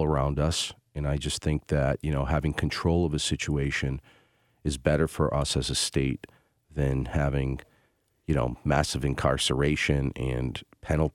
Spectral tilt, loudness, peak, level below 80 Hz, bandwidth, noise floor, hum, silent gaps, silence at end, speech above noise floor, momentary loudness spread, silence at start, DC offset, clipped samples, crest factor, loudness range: -5 dB/octave; -28 LUFS; -8 dBFS; -38 dBFS; 14.5 kHz; -69 dBFS; none; none; 0.05 s; 42 dB; 8 LU; 0 s; under 0.1%; under 0.1%; 20 dB; 2 LU